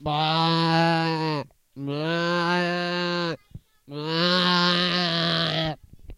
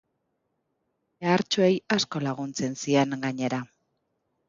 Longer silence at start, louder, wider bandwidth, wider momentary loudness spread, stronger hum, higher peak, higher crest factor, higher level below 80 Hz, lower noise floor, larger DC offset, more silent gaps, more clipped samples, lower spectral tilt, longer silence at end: second, 0 s vs 1.2 s; first, -23 LUFS vs -26 LUFS; first, 11 kHz vs 7.6 kHz; first, 14 LU vs 8 LU; neither; about the same, -8 dBFS vs -8 dBFS; about the same, 18 dB vs 20 dB; first, -56 dBFS vs -70 dBFS; second, -47 dBFS vs -77 dBFS; neither; neither; neither; about the same, -5.5 dB/octave vs -5 dB/octave; second, 0.05 s vs 0.85 s